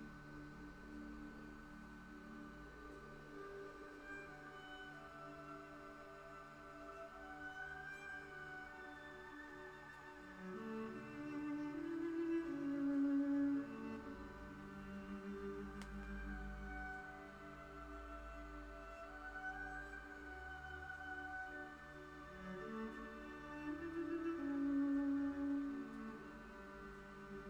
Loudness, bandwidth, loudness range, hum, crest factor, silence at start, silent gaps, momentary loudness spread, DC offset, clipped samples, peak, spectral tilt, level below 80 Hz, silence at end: -48 LUFS; 9.6 kHz; 12 LU; none; 16 dB; 0 s; none; 15 LU; under 0.1%; under 0.1%; -32 dBFS; -6.5 dB/octave; -62 dBFS; 0 s